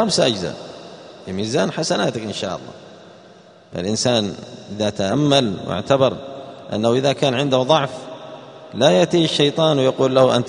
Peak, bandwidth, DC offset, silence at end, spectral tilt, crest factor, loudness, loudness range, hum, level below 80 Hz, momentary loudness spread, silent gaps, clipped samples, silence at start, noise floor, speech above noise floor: 0 dBFS; 10.5 kHz; under 0.1%; 0 s; -5 dB/octave; 20 dB; -18 LUFS; 7 LU; none; -56 dBFS; 19 LU; none; under 0.1%; 0 s; -46 dBFS; 28 dB